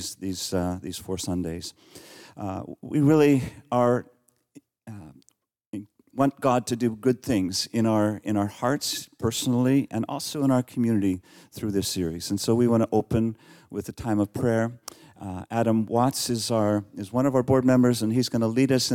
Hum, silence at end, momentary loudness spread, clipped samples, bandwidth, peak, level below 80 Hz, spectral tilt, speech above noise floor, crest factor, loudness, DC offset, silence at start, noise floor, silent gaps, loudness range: none; 0 s; 16 LU; under 0.1%; 17 kHz; -8 dBFS; -60 dBFS; -5.5 dB/octave; 31 dB; 16 dB; -25 LUFS; under 0.1%; 0 s; -55 dBFS; 5.66-5.71 s; 4 LU